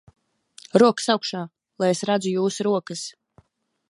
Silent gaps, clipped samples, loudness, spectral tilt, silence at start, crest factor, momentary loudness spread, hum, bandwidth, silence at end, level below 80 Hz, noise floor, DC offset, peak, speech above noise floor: none; under 0.1%; -22 LUFS; -4.5 dB/octave; 0.75 s; 22 dB; 15 LU; none; 11.5 kHz; 0.8 s; -70 dBFS; -59 dBFS; under 0.1%; -2 dBFS; 38 dB